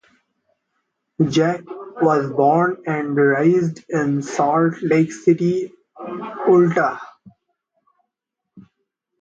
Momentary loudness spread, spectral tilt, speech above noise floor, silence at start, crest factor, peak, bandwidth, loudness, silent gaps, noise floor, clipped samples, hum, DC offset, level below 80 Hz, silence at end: 15 LU; -7 dB/octave; 64 dB; 1.2 s; 16 dB; -4 dBFS; 7.8 kHz; -18 LUFS; none; -81 dBFS; under 0.1%; none; under 0.1%; -64 dBFS; 0.6 s